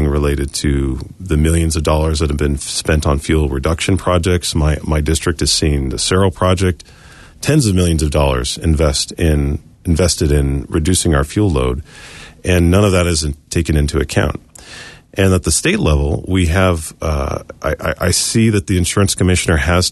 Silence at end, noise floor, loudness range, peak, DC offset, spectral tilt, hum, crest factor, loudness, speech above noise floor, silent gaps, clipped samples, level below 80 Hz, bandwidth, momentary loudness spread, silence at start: 0 s; -36 dBFS; 1 LU; -2 dBFS; under 0.1%; -5 dB/octave; none; 14 dB; -15 LUFS; 21 dB; none; under 0.1%; -22 dBFS; 12.5 kHz; 8 LU; 0 s